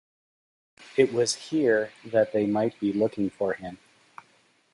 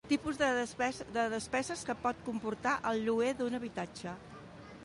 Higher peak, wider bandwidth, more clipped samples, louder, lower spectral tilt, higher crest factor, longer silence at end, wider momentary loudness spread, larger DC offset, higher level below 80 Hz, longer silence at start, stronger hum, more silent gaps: first, -8 dBFS vs -16 dBFS; about the same, 11.5 kHz vs 11.5 kHz; neither; first, -26 LUFS vs -35 LUFS; about the same, -4.5 dB/octave vs -4 dB/octave; about the same, 20 dB vs 18 dB; first, 1 s vs 0 s; second, 7 LU vs 13 LU; neither; about the same, -66 dBFS vs -62 dBFS; first, 0.8 s vs 0.05 s; neither; neither